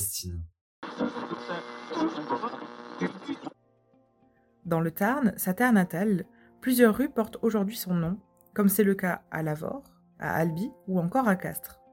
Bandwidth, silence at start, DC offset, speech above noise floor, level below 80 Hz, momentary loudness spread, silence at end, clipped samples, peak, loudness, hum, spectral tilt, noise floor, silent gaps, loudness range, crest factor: 17 kHz; 0 s; under 0.1%; 37 dB; -60 dBFS; 16 LU; 0.2 s; under 0.1%; -6 dBFS; -28 LUFS; none; -6 dB/octave; -65 dBFS; 0.61-0.82 s; 8 LU; 22 dB